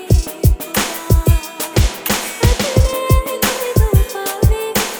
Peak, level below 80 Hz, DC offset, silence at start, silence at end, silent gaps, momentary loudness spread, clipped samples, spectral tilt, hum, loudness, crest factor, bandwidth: 0 dBFS; -18 dBFS; under 0.1%; 0 s; 0 s; none; 4 LU; under 0.1%; -4.5 dB/octave; none; -16 LUFS; 14 dB; over 20 kHz